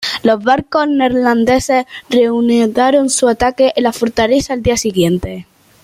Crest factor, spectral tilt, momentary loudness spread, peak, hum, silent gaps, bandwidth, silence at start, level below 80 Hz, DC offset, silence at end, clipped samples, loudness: 12 dB; -4.5 dB/octave; 4 LU; -2 dBFS; none; none; 15.5 kHz; 0 s; -38 dBFS; under 0.1%; 0.4 s; under 0.1%; -13 LUFS